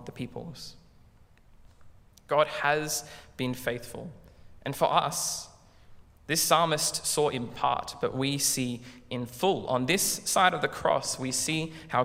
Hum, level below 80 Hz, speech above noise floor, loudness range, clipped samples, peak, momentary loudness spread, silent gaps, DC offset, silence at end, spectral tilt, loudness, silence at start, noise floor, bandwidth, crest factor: none; -58 dBFS; 28 dB; 5 LU; under 0.1%; -6 dBFS; 17 LU; none; under 0.1%; 0 s; -3 dB/octave; -28 LUFS; 0 s; -57 dBFS; 16 kHz; 22 dB